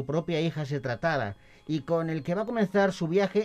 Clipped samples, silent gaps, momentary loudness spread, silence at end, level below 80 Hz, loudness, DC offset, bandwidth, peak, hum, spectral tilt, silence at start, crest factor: under 0.1%; none; 8 LU; 0 s; -60 dBFS; -29 LUFS; under 0.1%; 10 kHz; -12 dBFS; none; -7 dB/octave; 0 s; 16 dB